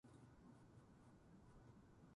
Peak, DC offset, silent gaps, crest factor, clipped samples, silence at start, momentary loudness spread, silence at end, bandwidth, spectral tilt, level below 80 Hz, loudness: -54 dBFS; under 0.1%; none; 12 dB; under 0.1%; 0.05 s; 2 LU; 0 s; 11 kHz; -7 dB/octave; -76 dBFS; -68 LUFS